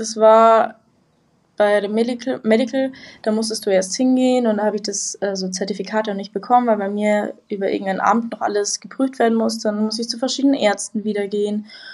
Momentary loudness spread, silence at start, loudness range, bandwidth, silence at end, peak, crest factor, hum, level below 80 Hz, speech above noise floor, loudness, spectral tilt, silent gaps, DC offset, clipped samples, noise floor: 8 LU; 0 s; 2 LU; 12 kHz; 0 s; 0 dBFS; 18 dB; none; -72 dBFS; 42 dB; -19 LUFS; -4 dB/octave; none; under 0.1%; under 0.1%; -60 dBFS